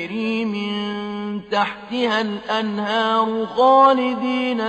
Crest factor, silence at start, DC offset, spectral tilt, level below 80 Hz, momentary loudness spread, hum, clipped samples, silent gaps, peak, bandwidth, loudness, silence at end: 16 dB; 0 s; under 0.1%; -5.5 dB/octave; -62 dBFS; 11 LU; none; under 0.1%; none; -4 dBFS; 8.6 kHz; -20 LUFS; 0 s